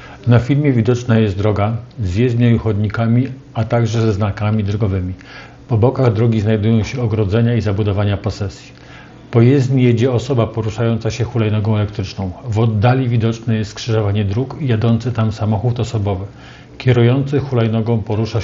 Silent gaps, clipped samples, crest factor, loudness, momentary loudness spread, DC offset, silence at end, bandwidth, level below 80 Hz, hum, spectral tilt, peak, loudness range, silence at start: none; under 0.1%; 16 dB; -16 LUFS; 8 LU; under 0.1%; 0 s; 7.6 kHz; -42 dBFS; none; -8 dB/octave; 0 dBFS; 2 LU; 0 s